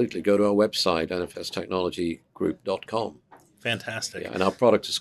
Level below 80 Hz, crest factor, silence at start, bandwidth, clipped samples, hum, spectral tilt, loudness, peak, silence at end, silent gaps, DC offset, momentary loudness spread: -62 dBFS; 20 dB; 0 s; 13.5 kHz; under 0.1%; none; -4.5 dB/octave; -26 LUFS; -6 dBFS; 0 s; none; under 0.1%; 10 LU